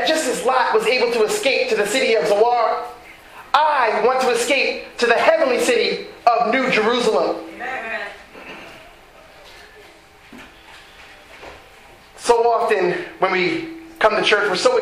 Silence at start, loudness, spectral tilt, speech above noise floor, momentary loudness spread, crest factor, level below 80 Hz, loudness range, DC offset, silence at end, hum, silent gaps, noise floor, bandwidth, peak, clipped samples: 0 s; -18 LUFS; -2.5 dB/octave; 28 dB; 18 LU; 20 dB; -56 dBFS; 10 LU; under 0.1%; 0 s; none; none; -46 dBFS; 16 kHz; 0 dBFS; under 0.1%